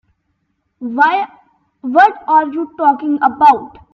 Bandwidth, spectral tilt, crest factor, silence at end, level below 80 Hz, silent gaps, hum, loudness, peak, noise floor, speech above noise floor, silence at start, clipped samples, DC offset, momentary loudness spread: 6.8 kHz; -5.5 dB/octave; 14 dB; 0.25 s; -58 dBFS; none; none; -13 LUFS; 0 dBFS; -67 dBFS; 54 dB; 0.8 s; under 0.1%; under 0.1%; 14 LU